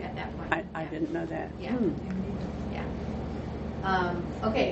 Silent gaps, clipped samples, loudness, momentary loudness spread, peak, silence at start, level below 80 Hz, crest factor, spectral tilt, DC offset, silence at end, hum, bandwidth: none; under 0.1%; -32 LUFS; 8 LU; -8 dBFS; 0 s; -44 dBFS; 24 dB; -5.5 dB/octave; under 0.1%; 0 s; none; 8 kHz